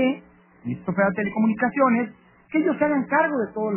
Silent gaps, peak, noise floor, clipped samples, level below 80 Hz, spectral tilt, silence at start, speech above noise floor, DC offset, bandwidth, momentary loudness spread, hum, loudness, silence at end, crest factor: none; -6 dBFS; -48 dBFS; under 0.1%; -62 dBFS; -11 dB/octave; 0 s; 26 dB; under 0.1%; 3.2 kHz; 12 LU; none; -23 LUFS; 0 s; 16 dB